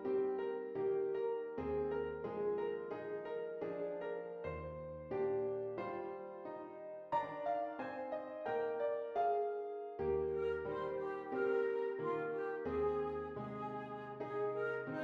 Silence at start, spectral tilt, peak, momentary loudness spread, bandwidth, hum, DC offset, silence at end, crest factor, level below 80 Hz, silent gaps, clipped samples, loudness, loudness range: 0 s; -8.5 dB/octave; -26 dBFS; 8 LU; 5 kHz; none; under 0.1%; 0 s; 14 dB; -68 dBFS; none; under 0.1%; -41 LUFS; 4 LU